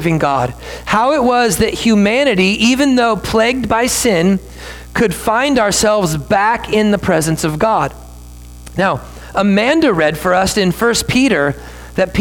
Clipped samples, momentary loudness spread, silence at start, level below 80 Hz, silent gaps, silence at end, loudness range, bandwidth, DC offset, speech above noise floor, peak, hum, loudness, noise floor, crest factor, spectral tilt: under 0.1%; 8 LU; 0 s; -36 dBFS; none; 0 s; 3 LU; 19 kHz; under 0.1%; 20 dB; -2 dBFS; 60 Hz at -35 dBFS; -14 LUFS; -33 dBFS; 12 dB; -4.5 dB/octave